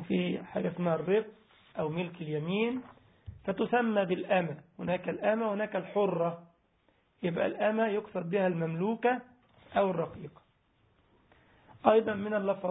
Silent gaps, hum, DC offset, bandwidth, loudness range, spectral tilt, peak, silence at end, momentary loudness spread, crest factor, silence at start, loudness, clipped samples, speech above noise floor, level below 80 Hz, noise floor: none; none; under 0.1%; 3.9 kHz; 3 LU; -3.5 dB/octave; -8 dBFS; 0 s; 10 LU; 24 dB; 0 s; -31 LUFS; under 0.1%; 40 dB; -66 dBFS; -70 dBFS